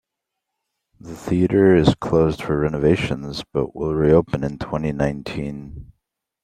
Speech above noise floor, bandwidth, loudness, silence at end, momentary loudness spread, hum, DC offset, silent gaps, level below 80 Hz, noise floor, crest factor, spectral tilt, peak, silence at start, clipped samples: 62 dB; 13 kHz; -20 LUFS; 0.6 s; 14 LU; none; under 0.1%; none; -40 dBFS; -81 dBFS; 18 dB; -7.5 dB/octave; -2 dBFS; 1.05 s; under 0.1%